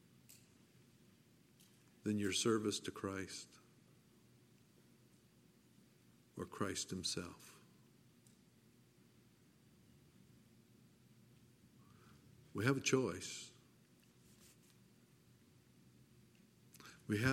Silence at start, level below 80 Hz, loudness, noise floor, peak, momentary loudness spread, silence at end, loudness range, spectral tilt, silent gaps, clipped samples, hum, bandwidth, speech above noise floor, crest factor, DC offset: 0.3 s; -80 dBFS; -41 LUFS; -69 dBFS; -20 dBFS; 29 LU; 0 s; 16 LU; -4 dB/octave; none; under 0.1%; none; 16.5 kHz; 29 dB; 26 dB; under 0.1%